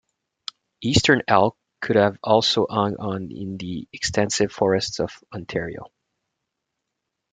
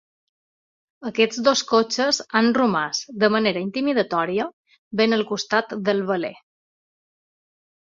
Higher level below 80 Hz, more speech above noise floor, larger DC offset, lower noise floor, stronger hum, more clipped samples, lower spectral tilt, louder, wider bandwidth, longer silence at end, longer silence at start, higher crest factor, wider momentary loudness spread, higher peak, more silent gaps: first, -50 dBFS vs -66 dBFS; second, 59 dB vs over 69 dB; neither; second, -81 dBFS vs under -90 dBFS; neither; neither; about the same, -4.5 dB/octave vs -4 dB/octave; about the same, -22 LUFS vs -21 LUFS; first, 9.6 kHz vs 7.6 kHz; second, 1.45 s vs 1.6 s; second, 0.8 s vs 1 s; about the same, 22 dB vs 20 dB; first, 17 LU vs 8 LU; about the same, -2 dBFS vs -4 dBFS; second, none vs 4.53-4.64 s, 4.78-4.91 s